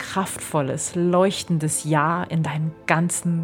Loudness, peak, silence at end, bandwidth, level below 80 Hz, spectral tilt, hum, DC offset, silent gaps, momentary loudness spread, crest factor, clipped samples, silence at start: -22 LUFS; -2 dBFS; 0 s; 17.5 kHz; -60 dBFS; -5 dB/octave; none; under 0.1%; none; 6 LU; 20 dB; under 0.1%; 0 s